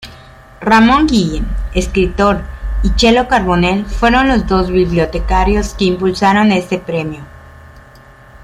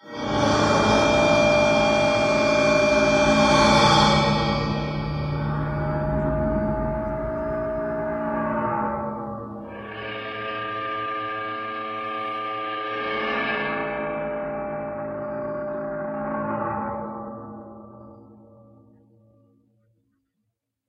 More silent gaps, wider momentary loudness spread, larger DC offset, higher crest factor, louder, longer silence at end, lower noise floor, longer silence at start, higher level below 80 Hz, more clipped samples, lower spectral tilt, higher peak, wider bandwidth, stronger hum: neither; second, 10 LU vs 14 LU; neither; second, 14 dB vs 20 dB; first, -13 LUFS vs -23 LUFS; second, 0.05 s vs 2.55 s; second, -40 dBFS vs -78 dBFS; about the same, 0 s vs 0.05 s; first, -22 dBFS vs -40 dBFS; neither; about the same, -5.5 dB/octave vs -5 dB/octave; first, 0 dBFS vs -4 dBFS; first, 13 kHz vs 11 kHz; neither